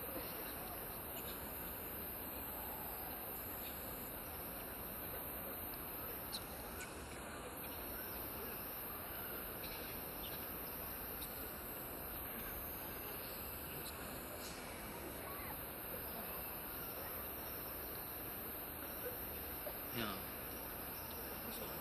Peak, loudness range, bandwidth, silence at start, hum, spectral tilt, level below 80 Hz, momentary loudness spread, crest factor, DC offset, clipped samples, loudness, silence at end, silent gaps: -26 dBFS; 1 LU; 14.5 kHz; 0 s; none; -3.5 dB/octave; -60 dBFS; 2 LU; 22 dB; under 0.1%; under 0.1%; -45 LUFS; 0 s; none